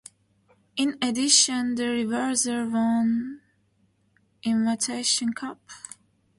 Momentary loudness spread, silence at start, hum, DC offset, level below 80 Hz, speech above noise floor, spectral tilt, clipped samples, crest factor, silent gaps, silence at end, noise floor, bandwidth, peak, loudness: 19 LU; 0.75 s; none; under 0.1%; -70 dBFS; 42 dB; -2 dB/octave; under 0.1%; 22 dB; none; 0.6 s; -67 dBFS; 11.5 kHz; -4 dBFS; -24 LUFS